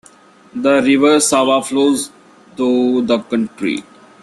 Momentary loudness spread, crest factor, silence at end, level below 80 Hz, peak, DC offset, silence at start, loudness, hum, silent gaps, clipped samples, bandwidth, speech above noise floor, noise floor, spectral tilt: 10 LU; 14 dB; 0.4 s; -58 dBFS; -2 dBFS; under 0.1%; 0.55 s; -15 LUFS; none; none; under 0.1%; 13 kHz; 31 dB; -45 dBFS; -3.5 dB/octave